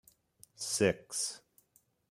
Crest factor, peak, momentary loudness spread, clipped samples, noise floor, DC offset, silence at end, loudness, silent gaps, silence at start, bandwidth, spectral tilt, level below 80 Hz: 24 dB; -14 dBFS; 12 LU; under 0.1%; -72 dBFS; under 0.1%; 0.7 s; -33 LUFS; none; 0.6 s; 16 kHz; -3 dB/octave; -70 dBFS